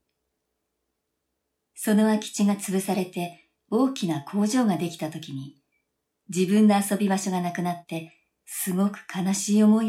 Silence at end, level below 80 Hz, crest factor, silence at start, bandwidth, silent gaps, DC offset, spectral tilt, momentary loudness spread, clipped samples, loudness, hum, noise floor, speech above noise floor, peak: 0 s; -76 dBFS; 16 dB; 1.75 s; 15.5 kHz; none; under 0.1%; -5.5 dB/octave; 15 LU; under 0.1%; -25 LUFS; none; -80 dBFS; 56 dB; -10 dBFS